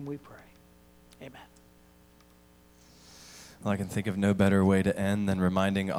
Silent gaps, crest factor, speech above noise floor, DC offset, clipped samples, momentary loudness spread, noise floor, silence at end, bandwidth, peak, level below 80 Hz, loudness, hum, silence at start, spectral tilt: none; 20 dB; 31 dB; under 0.1%; under 0.1%; 25 LU; -59 dBFS; 0 s; 14.5 kHz; -10 dBFS; -60 dBFS; -27 LUFS; none; 0 s; -7 dB/octave